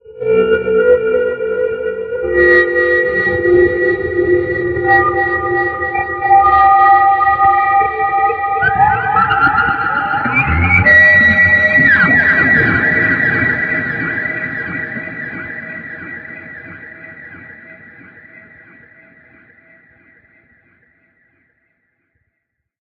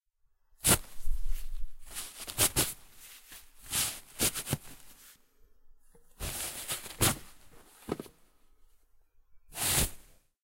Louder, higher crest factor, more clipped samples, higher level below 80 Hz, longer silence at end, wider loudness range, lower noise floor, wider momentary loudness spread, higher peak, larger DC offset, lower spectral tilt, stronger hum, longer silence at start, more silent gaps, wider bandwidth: first, -11 LUFS vs -31 LUFS; second, 14 dB vs 24 dB; neither; about the same, -40 dBFS vs -42 dBFS; first, 5.05 s vs 0.45 s; first, 16 LU vs 4 LU; first, -74 dBFS vs -70 dBFS; second, 18 LU vs 23 LU; first, 0 dBFS vs -10 dBFS; neither; first, -8 dB/octave vs -2 dB/octave; neither; second, 0.1 s vs 0.65 s; neither; second, 6.2 kHz vs 16 kHz